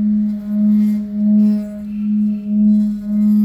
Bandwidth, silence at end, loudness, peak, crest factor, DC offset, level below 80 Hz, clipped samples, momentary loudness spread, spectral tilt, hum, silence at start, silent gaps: 2.7 kHz; 0 s; -16 LUFS; -6 dBFS; 8 dB; under 0.1%; -48 dBFS; under 0.1%; 6 LU; -10.5 dB/octave; none; 0 s; none